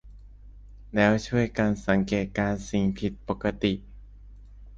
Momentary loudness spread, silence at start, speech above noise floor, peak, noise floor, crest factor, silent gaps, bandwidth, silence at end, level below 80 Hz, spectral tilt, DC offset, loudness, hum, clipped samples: 8 LU; 0.05 s; 21 dB; -6 dBFS; -47 dBFS; 20 dB; none; 7.8 kHz; 0 s; -44 dBFS; -6.5 dB/octave; under 0.1%; -26 LUFS; 50 Hz at -45 dBFS; under 0.1%